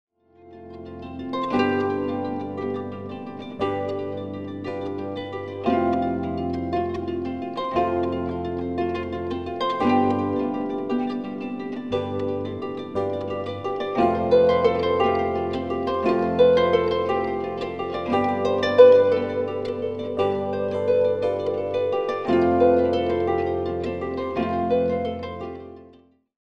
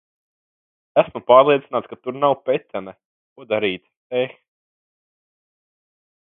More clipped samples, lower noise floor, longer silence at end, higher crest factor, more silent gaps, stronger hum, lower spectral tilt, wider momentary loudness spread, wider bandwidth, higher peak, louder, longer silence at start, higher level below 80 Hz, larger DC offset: neither; second, -53 dBFS vs under -90 dBFS; second, 0.55 s vs 2.05 s; about the same, 22 dB vs 22 dB; second, none vs 3.05-3.36 s, 3.97-4.10 s; neither; second, -7.5 dB/octave vs -9.5 dB/octave; second, 13 LU vs 18 LU; first, 6.8 kHz vs 4 kHz; about the same, -2 dBFS vs 0 dBFS; second, -23 LUFS vs -19 LUFS; second, 0.45 s vs 0.95 s; first, -52 dBFS vs -66 dBFS; first, 0.2% vs under 0.1%